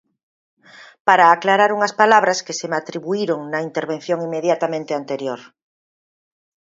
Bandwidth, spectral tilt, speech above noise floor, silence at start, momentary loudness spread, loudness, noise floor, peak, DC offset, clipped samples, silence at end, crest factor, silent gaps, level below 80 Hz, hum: 7.8 kHz; -4 dB/octave; over 72 dB; 0.8 s; 12 LU; -18 LUFS; under -90 dBFS; 0 dBFS; under 0.1%; under 0.1%; 1.3 s; 20 dB; 1.00-1.05 s; -74 dBFS; none